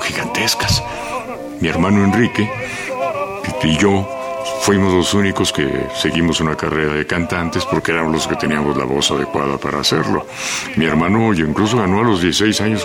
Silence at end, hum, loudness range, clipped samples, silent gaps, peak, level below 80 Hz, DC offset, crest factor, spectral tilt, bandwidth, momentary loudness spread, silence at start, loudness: 0 s; none; 1 LU; under 0.1%; none; -2 dBFS; -38 dBFS; under 0.1%; 16 dB; -4.5 dB/octave; 16.5 kHz; 7 LU; 0 s; -16 LUFS